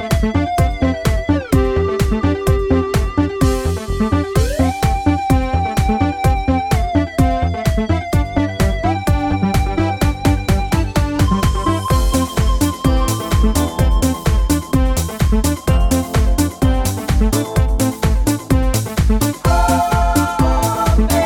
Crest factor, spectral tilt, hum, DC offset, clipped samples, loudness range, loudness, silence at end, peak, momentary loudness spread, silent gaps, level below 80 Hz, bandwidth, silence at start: 14 dB; -6 dB/octave; none; under 0.1%; under 0.1%; 1 LU; -17 LUFS; 0 s; -2 dBFS; 2 LU; none; -20 dBFS; 18 kHz; 0 s